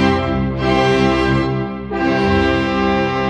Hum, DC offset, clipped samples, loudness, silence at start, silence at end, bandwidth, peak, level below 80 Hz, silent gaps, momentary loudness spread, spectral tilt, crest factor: none; under 0.1%; under 0.1%; -16 LUFS; 0 s; 0 s; 10 kHz; -2 dBFS; -30 dBFS; none; 6 LU; -6.5 dB/octave; 14 dB